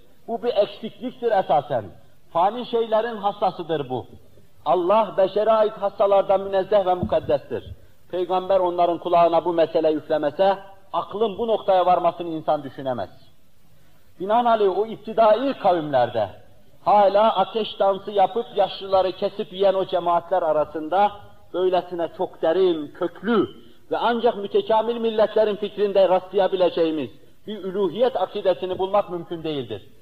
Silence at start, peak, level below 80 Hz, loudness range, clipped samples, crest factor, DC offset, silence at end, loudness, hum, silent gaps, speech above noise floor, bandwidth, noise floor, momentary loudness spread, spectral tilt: 0.3 s; -8 dBFS; -58 dBFS; 3 LU; under 0.1%; 14 dB; 0.6%; 0.2 s; -22 LUFS; none; none; 37 dB; 5.2 kHz; -58 dBFS; 11 LU; -7.5 dB/octave